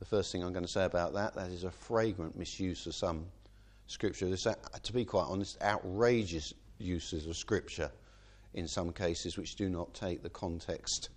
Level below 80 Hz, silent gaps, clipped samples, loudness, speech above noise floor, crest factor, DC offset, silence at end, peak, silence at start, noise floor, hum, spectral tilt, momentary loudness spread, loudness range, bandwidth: -54 dBFS; none; under 0.1%; -36 LUFS; 23 dB; 22 dB; under 0.1%; 0 s; -14 dBFS; 0 s; -58 dBFS; none; -4.5 dB/octave; 8 LU; 4 LU; 10.5 kHz